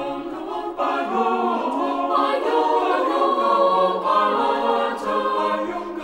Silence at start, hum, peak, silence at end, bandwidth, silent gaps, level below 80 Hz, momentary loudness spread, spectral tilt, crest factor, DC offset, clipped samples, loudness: 0 s; none; -6 dBFS; 0 s; 12.5 kHz; none; -58 dBFS; 8 LU; -5 dB/octave; 14 dB; under 0.1%; under 0.1%; -21 LUFS